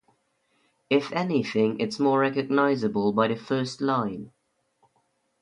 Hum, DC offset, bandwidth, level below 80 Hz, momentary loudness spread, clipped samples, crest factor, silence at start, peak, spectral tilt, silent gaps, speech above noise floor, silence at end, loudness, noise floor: none; under 0.1%; 10.5 kHz; -68 dBFS; 5 LU; under 0.1%; 20 dB; 0.9 s; -8 dBFS; -6.5 dB/octave; none; 47 dB; 1.15 s; -25 LUFS; -71 dBFS